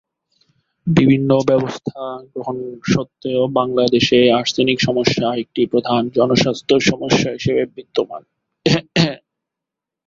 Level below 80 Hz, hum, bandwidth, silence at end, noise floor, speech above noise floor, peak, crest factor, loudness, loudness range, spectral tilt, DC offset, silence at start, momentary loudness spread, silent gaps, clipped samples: -50 dBFS; none; 7.6 kHz; 0.9 s; -84 dBFS; 68 dB; 0 dBFS; 16 dB; -17 LUFS; 3 LU; -5.5 dB/octave; under 0.1%; 0.85 s; 13 LU; none; under 0.1%